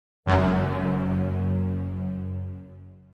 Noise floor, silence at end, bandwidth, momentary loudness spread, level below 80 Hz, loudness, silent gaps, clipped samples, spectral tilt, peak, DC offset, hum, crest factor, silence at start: -46 dBFS; 0.15 s; 6.6 kHz; 14 LU; -46 dBFS; -26 LUFS; none; under 0.1%; -9 dB/octave; -8 dBFS; under 0.1%; none; 18 dB; 0.25 s